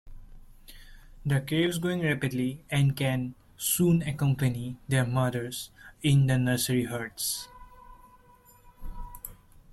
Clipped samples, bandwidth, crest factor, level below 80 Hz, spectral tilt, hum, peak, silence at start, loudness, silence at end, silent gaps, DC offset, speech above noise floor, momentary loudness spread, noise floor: under 0.1%; 15.5 kHz; 16 dB; -50 dBFS; -5 dB/octave; none; -12 dBFS; 0.05 s; -28 LUFS; 0.4 s; none; under 0.1%; 30 dB; 19 LU; -57 dBFS